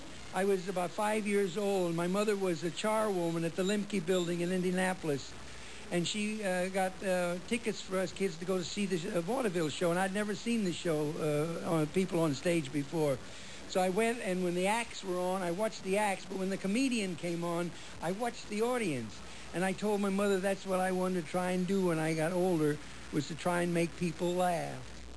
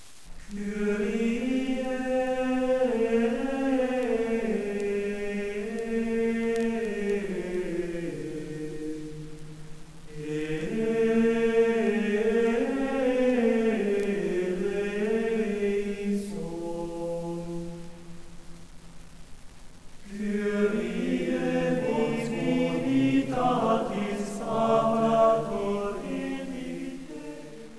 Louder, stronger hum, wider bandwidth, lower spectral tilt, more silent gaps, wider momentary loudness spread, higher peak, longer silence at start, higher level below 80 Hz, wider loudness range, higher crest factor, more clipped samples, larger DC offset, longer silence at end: second, -33 LUFS vs -28 LUFS; neither; about the same, 11 kHz vs 11 kHz; second, -5 dB/octave vs -6.5 dB/octave; neither; second, 6 LU vs 13 LU; second, -20 dBFS vs -10 dBFS; about the same, 0 s vs 0 s; second, -60 dBFS vs -48 dBFS; second, 2 LU vs 10 LU; about the same, 14 dB vs 18 dB; neither; about the same, 0.4% vs 0.4%; about the same, 0 s vs 0 s